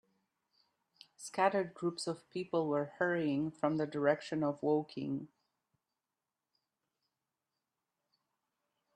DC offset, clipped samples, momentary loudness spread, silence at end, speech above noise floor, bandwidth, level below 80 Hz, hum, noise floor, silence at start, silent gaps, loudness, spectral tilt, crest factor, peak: under 0.1%; under 0.1%; 9 LU; 3.7 s; over 55 dB; 11.5 kHz; -80 dBFS; none; under -90 dBFS; 1.2 s; none; -35 LUFS; -6 dB/octave; 22 dB; -16 dBFS